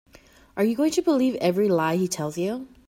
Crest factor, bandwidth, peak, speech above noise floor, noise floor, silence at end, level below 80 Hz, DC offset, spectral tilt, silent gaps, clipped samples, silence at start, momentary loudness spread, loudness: 14 dB; 16.5 kHz; -10 dBFS; 30 dB; -53 dBFS; 0.2 s; -62 dBFS; under 0.1%; -5.5 dB/octave; none; under 0.1%; 0.55 s; 7 LU; -23 LUFS